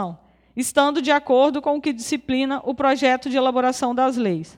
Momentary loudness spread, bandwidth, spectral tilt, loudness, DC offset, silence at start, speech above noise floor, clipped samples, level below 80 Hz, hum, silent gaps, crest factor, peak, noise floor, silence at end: 7 LU; 16.5 kHz; -4 dB/octave; -20 LUFS; under 0.1%; 0 s; 20 dB; under 0.1%; -58 dBFS; none; none; 16 dB; -4 dBFS; -40 dBFS; 0.1 s